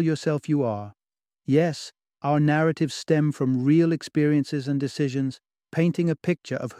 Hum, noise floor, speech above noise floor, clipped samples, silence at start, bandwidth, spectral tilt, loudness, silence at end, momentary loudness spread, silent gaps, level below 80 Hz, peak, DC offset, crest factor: none; -88 dBFS; 65 dB; under 0.1%; 0 s; 11.5 kHz; -7 dB/octave; -24 LUFS; 0.05 s; 11 LU; none; -66 dBFS; -8 dBFS; under 0.1%; 16 dB